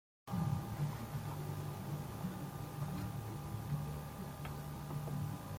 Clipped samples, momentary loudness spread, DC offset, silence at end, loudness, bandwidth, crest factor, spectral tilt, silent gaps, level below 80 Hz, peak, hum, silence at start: under 0.1%; 6 LU; under 0.1%; 0 s; -43 LUFS; 16.5 kHz; 16 dB; -6.5 dB/octave; none; -58 dBFS; -26 dBFS; none; 0.25 s